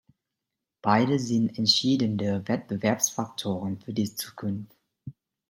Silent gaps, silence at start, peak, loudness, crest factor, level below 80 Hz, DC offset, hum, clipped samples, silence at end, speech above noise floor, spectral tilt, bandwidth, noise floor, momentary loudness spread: none; 0.85 s; -6 dBFS; -26 LUFS; 22 dB; -68 dBFS; under 0.1%; none; under 0.1%; 0.4 s; 60 dB; -4 dB/octave; 16.5 kHz; -86 dBFS; 14 LU